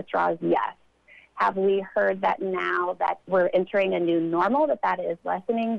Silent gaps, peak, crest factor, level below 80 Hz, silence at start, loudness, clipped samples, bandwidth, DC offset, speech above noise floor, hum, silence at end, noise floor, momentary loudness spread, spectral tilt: none; -12 dBFS; 14 dB; -68 dBFS; 0 s; -25 LUFS; under 0.1%; 6.8 kHz; under 0.1%; 31 dB; none; 0 s; -55 dBFS; 5 LU; -7.5 dB/octave